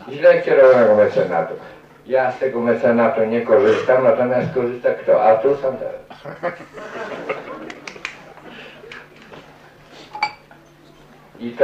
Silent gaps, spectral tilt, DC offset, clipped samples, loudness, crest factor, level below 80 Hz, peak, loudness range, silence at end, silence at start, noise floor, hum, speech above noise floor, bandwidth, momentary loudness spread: none; -6.5 dB/octave; under 0.1%; under 0.1%; -17 LUFS; 18 dB; -60 dBFS; 0 dBFS; 16 LU; 0 s; 0 s; -47 dBFS; none; 31 dB; 7.8 kHz; 23 LU